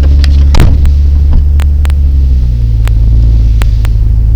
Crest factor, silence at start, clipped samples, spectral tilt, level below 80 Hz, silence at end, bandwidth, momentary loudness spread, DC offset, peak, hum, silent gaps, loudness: 4 dB; 0 s; 2%; -7 dB/octave; -6 dBFS; 0 s; 9.2 kHz; 3 LU; under 0.1%; 0 dBFS; none; none; -9 LUFS